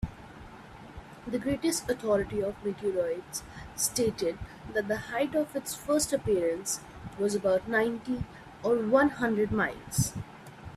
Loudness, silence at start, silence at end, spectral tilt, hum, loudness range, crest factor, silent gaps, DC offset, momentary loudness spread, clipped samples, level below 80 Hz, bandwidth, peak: -30 LUFS; 0 s; 0 s; -4.5 dB/octave; none; 3 LU; 20 dB; none; under 0.1%; 18 LU; under 0.1%; -52 dBFS; 15.5 kHz; -12 dBFS